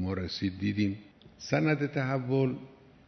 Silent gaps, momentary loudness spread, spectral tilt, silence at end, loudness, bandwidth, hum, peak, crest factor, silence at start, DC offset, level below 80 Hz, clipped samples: none; 11 LU; -7 dB/octave; 0.35 s; -30 LUFS; 6.4 kHz; none; -12 dBFS; 18 dB; 0 s; under 0.1%; -62 dBFS; under 0.1%